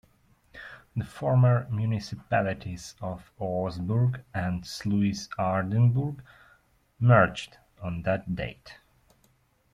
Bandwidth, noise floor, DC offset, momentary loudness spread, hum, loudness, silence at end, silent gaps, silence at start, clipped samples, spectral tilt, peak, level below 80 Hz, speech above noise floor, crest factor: 11 kHz; -66 dBFS; under 0.1%; 17 LU; none; -27 LUFS; 1 s; none; 0.55 s; under 0.1%; -7.5 dB/octave; -6 dBFS; -54 dBFS; 40 dB; 20 dB